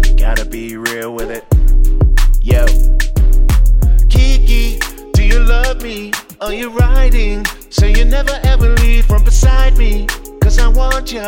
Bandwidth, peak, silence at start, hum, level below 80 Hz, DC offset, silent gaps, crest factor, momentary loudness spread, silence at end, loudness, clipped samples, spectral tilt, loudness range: 16 kHz; 0 dBFS; 0 s; none; -10 dBFS; under 0.1%; none; 8 dB; 9 LU; 0 s; -14 LUFS; under 0.1%; -5 dB/octave; 2 LU